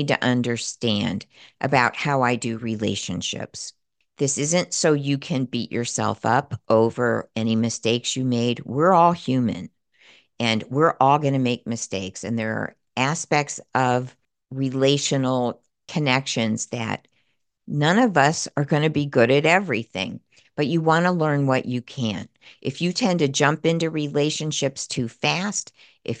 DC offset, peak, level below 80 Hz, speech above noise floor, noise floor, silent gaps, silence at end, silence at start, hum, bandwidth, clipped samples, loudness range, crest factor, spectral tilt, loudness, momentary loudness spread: under 0.1%; -2 dBFS; -64 dBFS; 49 dB; -71 dBFS; none; 0 s; 0 s; none; 10 kHz; under 0.1%; 3 LU; 20 dB; -4.5 dB/octave; -22 LUFS; 11 LU